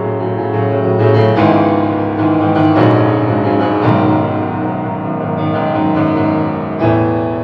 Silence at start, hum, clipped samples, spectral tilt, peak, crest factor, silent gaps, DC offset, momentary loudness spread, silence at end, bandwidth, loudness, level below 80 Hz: 0 s; none; under 0.1%; -10 dB/octave; 0 dBFS; 12 dB; none; under 0.1%; 7 LU; 0 s; 5.6 kHz; -13 LUFS; -46 dBFS